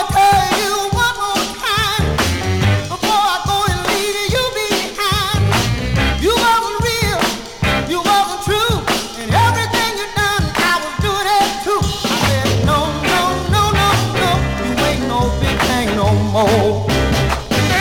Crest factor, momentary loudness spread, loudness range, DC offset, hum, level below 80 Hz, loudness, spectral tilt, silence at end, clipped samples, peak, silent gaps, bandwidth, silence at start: 12 dB; 4 LU; 1 LU; under 0.1%; none; -28 dBFS; -15 LUFS; -4 dB/octave; 0 s; under 0.1%; -2 dBFS; none; 19 kHz; 0 s